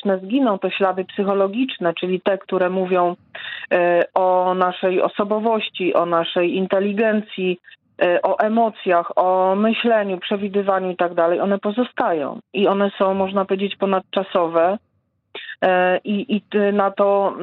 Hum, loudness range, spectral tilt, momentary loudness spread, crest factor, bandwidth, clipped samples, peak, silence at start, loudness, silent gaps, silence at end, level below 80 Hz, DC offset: none; 2 LU; -9 dB/octave; 5 LU; 18 dB; 4.4 kHz; under 0.1%; -2 dBFS; 0.05 s; -19 LUFS; none; 0 s; -70 dBFS; under 0.1%